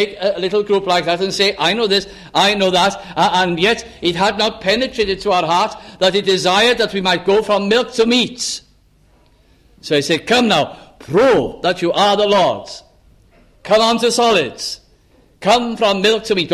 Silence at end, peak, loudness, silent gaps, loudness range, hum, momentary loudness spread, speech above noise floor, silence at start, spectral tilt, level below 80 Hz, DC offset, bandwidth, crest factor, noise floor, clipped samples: 0 s; -2 dBFS; -15 LUFS; none; 3 LU; none; 9 LU; 37 dB; 0 s; -3.5 dB/octave; -48 dBFS; under 0.1%; 15 kHz; 14 dB; -52 dBFS; under 0.1%